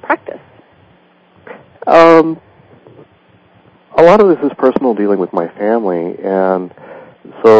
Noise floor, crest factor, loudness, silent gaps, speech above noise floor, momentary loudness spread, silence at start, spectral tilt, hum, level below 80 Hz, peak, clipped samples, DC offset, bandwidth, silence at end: -48 dBFS; 12 dB; -11 LUFS; none; 38 dB; 12 LU; 0.05 s; -7 dB/octave; none; -54 dBFS; 0 dBFS; 2%; under 0.1%; 8 kHz; 0 s